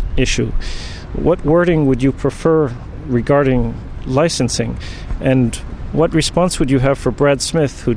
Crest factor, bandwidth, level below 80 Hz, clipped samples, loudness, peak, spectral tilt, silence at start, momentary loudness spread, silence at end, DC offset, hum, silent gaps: 12 dB; 13.5 kHz; -26 dBFS; under 0.1%; -16 LUFS; -2 dBFS; -5.5 dB/octave; 0 s; 13 LU; 0 s; under 0.1%; none; none